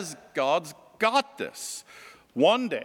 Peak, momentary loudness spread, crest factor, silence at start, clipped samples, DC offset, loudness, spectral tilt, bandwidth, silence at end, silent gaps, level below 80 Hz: -8 dBFS; 15 LU; 20 dB; 0 s; under 0.1%; under 0.1%; -26 LUFS; -3 dB/octave; 17.5 kHz; 0 s; none; -78 dBFS